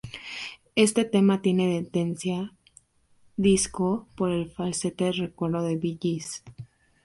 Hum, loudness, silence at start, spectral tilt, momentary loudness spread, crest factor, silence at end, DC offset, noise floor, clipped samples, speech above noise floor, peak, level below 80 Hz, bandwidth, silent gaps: none; -26 LUFS; 0.05 s; -5 dB/octave; 14 LU; 20 dB; 0.4 s; under 0.1%; -61 dBFS; under 0.1%; 36 dB; -8 dBFS; -56 dBFS; 11.5 kHz; none